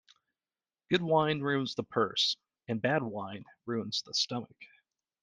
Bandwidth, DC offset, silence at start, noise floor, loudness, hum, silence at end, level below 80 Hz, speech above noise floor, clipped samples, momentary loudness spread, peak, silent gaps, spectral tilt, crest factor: 10 kHz; under 0.1%; 0.9 s; under -90 dBFS; -31 LUFS; none; 0.55 s; -72 dBFS; over 58 dB; under 0.1%; 12 LU; -12 dBFS; none; -4.5 dB/octave; 22 dB